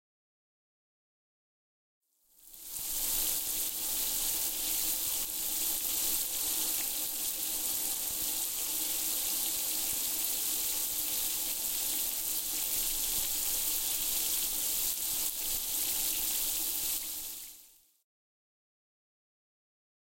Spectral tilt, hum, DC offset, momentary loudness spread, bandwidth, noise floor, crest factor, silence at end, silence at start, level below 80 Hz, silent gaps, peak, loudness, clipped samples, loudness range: 1 dB/octave; none; under 0.1%; 2 LU; 17 kHz; -61 dBFS; 22 dB; 2.35 s; 2.45 s; -56 dBFS; none; -14 dBFS; -30 LUFS; under 0.1%; 5 LU